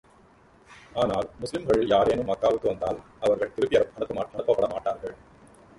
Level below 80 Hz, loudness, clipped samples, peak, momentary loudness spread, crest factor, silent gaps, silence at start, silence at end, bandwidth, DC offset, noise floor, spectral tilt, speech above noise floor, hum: -52 dBFS; -26 LUFS; under 0.1%; -8 dBFS; 10 LU; 18 dB; none; 0.7 s; 0.65 s; 11.5 kHz; under 0.1%; -56 dBFS; -6 dB/octave; 31 dB; none